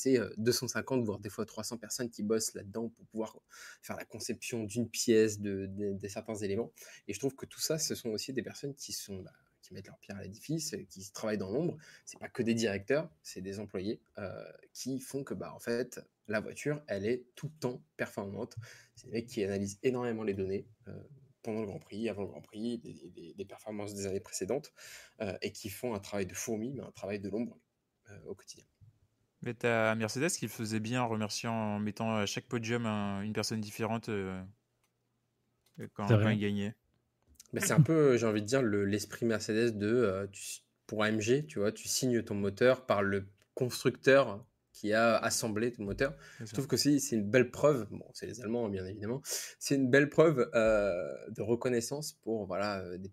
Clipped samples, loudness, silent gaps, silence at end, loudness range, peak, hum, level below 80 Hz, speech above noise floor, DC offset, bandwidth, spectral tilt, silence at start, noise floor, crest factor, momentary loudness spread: under 0.1%; -34 LUFS; none; 0 s; 10 LU; -12 dBFS; none; -68 dBFS; 46 dB; under 0.1%; 16 kHz; -5 dB/octave; 0 s; -80 dBFS; 22 dB; 18 LU